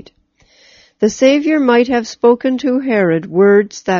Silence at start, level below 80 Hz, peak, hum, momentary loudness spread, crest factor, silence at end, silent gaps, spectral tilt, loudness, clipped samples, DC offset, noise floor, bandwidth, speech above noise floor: 1 s; -56 dBFS; 0 dBFS; none; 6 LU; 14 dB; 0 s; none; -5 dB/octave; -13 LUFS; under 0.1%; under 0.1%; -54 dBFS; 7.4 kHz; 42 dB